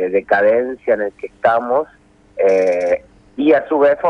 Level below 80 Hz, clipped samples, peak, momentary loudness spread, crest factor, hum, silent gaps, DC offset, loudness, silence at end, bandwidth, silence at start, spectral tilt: -54 dBFS; under 0.1%; 0 dBFS; 10 LU; 14 dB; none; none; under 0.1%; -16 LUFS; 0 s; 7 kHz; 0 s; -6 dB/octave